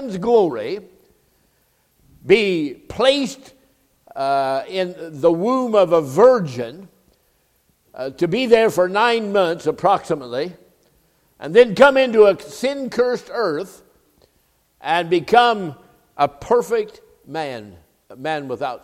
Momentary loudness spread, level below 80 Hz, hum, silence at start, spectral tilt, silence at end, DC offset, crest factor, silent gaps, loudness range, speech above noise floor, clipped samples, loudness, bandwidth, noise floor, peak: 17 LU; -56 dBFS; none; 0 s; -5 dB/octave; 0.05 s; under 0.1%; 20 dB; none; 4 LU; 45 dB; under 0.1%; -18 LUFS; 15 kHz; -62 dBFS; 0 dBFS